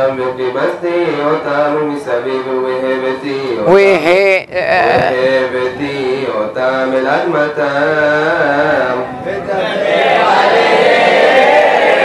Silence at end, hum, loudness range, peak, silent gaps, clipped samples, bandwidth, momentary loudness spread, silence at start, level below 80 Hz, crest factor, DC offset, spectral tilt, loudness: 0 s; none; 3 LU; 0 dBFS; none; under 0.1%; 12 kHz; 9 LU; 0 s; -52 dBFS; 12 dB; under 0.1%; -5 dB/octave; -12 LUFS